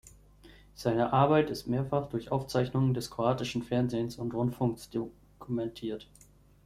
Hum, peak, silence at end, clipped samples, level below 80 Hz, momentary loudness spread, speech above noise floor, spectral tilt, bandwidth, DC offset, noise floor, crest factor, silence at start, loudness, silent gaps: 50 Hz at -55 dBFS; -10 dBFS; 0.65 s; under 0.1%; -58 dBFS; 12 LU; 26 dB; -7 dB/octave; 15 kHz; under 0.1%; -56 dBFS; 22 dB; 0.05 s; -31 LUFS; none